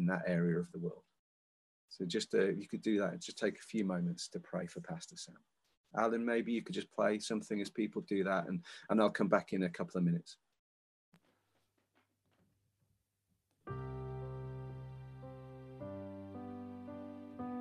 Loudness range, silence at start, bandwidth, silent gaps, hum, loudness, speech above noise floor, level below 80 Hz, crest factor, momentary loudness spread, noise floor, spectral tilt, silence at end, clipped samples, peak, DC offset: 13 LU; 0 s; 11.5 kHz; 1.19-1.88 s, 5.77-5.84 s, 10.59-11.12 s; none; -38 LUFS; 46 dB; -68 dBFS; 22 dB; 16 LU; -83 dBFS; -6 dB/octave; 0 s; under 0.1%; -16 dBFS; under 0.1%